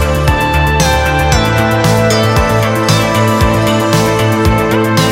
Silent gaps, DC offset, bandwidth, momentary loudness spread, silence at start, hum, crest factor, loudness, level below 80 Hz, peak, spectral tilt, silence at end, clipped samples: none; under 0.1%; 17 kHz; 1 LU; 0 s; none; 10 dB; -11 LUFS; -20 dBFS; 0 dBFS; -5 dB/octave; 0 s; under 0.1%